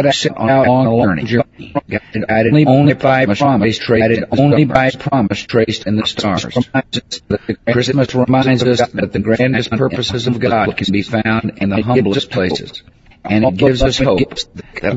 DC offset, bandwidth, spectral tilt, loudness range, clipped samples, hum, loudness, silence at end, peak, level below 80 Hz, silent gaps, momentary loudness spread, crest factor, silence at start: under 0.1%; 8 kHz; -6 dB/octave; 4 LU; under 0.1%; none; -14 LUFS; 0 s; 0 dBFS; -36 dBFS; none; 9 LU; 14 dB; 0 s